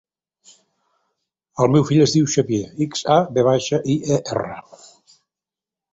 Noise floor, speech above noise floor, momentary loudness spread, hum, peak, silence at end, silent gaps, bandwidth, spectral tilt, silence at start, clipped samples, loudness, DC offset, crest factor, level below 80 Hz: -89 dBFS; 71 dB; 11 LU; none; -2 dBFS; 1.3 s; none; 8 kHz; -6 dB/octave; 1.55 s; under 0.1%; -18 LUFS; under 0.1%; 18 dB; -54 dBFS